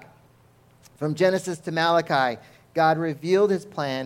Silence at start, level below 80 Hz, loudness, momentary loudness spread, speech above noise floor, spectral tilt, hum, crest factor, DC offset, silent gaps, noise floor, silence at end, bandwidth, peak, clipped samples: 1 s; -68 dBFS; -23 LUFS; 9 LU; 34 dB; -5.5 dB/octave; none; 18 dB; under 0.1%; none; -57 dBFS; 0 s; 16 kHz; -6 dBFS; under 0.1%